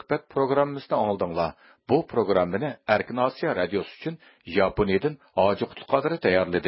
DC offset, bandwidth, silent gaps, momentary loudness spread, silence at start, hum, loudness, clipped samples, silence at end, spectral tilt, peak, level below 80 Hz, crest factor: under 0.1%; 5.8 kHz; none; 7 LU; 0.1 s; none; -25 LUFS; under 0.1%; 0 s; -10.5 dB/octave; -6 dBFS; -52 dBFS; 20 dB